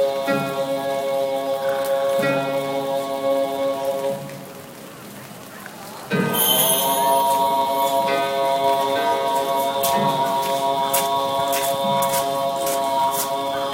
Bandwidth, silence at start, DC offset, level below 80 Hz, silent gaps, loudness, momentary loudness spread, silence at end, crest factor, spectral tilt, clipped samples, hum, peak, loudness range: 16.5 kHz; 0 s; under 0.1%; -64 dBFS; none; -20 LUFS; 17 LU; 0 s; 16 dB; -3 dB/octave; under 0.1%; none; -4 dBFS; 6 LU